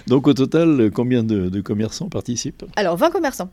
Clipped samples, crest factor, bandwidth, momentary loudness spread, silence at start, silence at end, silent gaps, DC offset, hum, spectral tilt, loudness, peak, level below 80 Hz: under 0.1%; 16 dB; 15.5 kHz; 10 LU; 0.05 s; 0.05 s; none; under 0.1%; none; -6 dB/octave; -19 LUFS; -2 dBFS; -48 dBFS